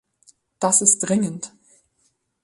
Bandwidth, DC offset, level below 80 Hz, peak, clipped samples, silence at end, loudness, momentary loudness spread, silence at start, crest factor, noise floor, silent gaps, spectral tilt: 11.5 kHz; under 0.1%; -66 dBFS; -2 dBFS; under 0.1%; 0.95 s; -18 LUFS; 19 LU; 0.6 s; 22 dB; -68 dBFS; none; -3.5 dB/octave